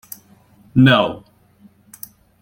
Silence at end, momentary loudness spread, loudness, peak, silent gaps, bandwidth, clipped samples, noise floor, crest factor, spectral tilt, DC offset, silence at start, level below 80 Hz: 1.25 s; 25 LU; -15 LUFS; -2 dBFS; none; 17 kHz; under 0.1%; -51 dBFS; 18 dB; -6.5 dB/octave; under 0.1%; 0.75 s; -54 dBFS